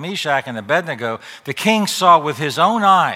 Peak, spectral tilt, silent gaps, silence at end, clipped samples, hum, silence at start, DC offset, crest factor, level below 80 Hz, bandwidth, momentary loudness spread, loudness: 0 dBFS; -4 dB/octave; none; 0 s; under 0.1%; none; 0 s; under 0.1%; 16 dB; -70 dBFS; 16.5 kHz; 12 LU; -16 LUFS